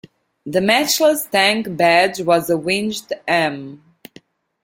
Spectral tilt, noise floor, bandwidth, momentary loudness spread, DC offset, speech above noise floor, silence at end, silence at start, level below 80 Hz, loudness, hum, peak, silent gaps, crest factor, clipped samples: -3 dB/octave; -49 dBFS; 16.5 kHz; 11 LU; under 0.1%; 32 dB; 0.9 s; 0.45 s; -60 dBFS; -17 LUFS; none; -2 dBFS; none; 18 dB; under 0.1%